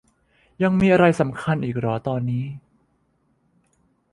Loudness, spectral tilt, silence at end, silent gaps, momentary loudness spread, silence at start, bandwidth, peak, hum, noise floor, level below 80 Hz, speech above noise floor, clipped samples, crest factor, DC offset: -21 LUFS; -8 dB/octave; 1.55 s; none; 12 LU; 0.6 s; 11 kHz; -4 dBFS; none; -66 dBFS; -52 dBFS; 46 dB; under 0.1%; 20 dB; under 0.1%